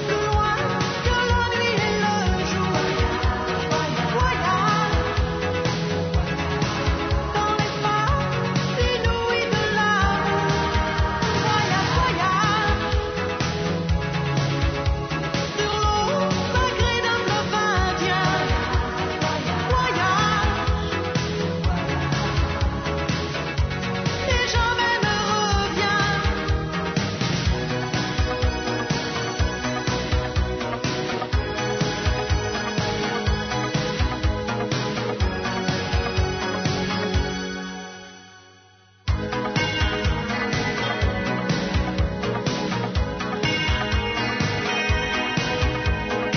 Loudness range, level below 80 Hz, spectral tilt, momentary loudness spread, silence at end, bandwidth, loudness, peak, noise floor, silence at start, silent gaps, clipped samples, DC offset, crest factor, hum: 3 LU; -32 dBFS; -5 dB/octave; 5 LU; 0 s; 6.6 kHz; -23 LUFS; -6 dBFS; -53 dBFS; 0 s; none; under 0.1%; under 0.1%; 16 dB; none